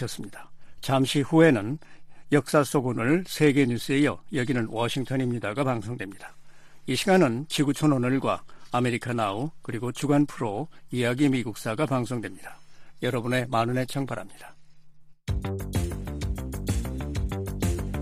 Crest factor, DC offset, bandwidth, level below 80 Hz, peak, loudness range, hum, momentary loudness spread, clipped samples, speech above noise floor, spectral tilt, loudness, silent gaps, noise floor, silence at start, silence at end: 20 dB; under 0.1%; 15.5 kHz; -42 dBFS; -6 dBFS; 7 LU; none; 13 LU; under 0.1%; 21 dB; -6 dB/octave; -26 LUFS; none; -47 dBFS; 0 s; 0 s